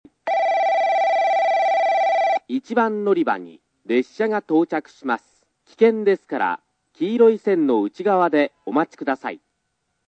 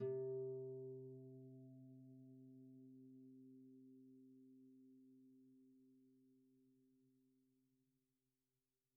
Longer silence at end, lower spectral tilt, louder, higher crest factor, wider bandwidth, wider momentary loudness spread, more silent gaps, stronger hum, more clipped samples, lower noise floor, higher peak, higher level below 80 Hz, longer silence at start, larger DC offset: second, 0.7 s vs 1.7 s; second, -6 dB/octave vs -8 dB/octave; first, -20 LUFS vs -55 LUFS; about the same, 16 dB vs 20 dB; first, 8.2 kHz vs 1.2 kHz; second, 9 LU vs 20 LU; neither; neither; neither; second, -74 dBFS vs under -90 dBFS; first, -4 dBFS vs -38 dBFS; first, -78 dBFS vs under -90 dBFS; first, 0.25 s vs 0 s; neither